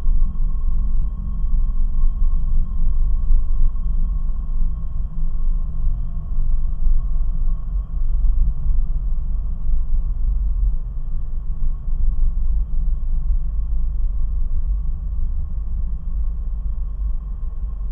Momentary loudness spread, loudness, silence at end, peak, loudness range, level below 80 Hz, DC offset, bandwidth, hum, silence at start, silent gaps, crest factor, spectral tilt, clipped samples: 5 LU; -26 LUFS; 0 s; -4 dBFS; 2 LU; -18 dBFS; under 0.1%; 1.2 kHz; none; 0 s; none; 12 dB; -11.5 dB/octave; under 0.1%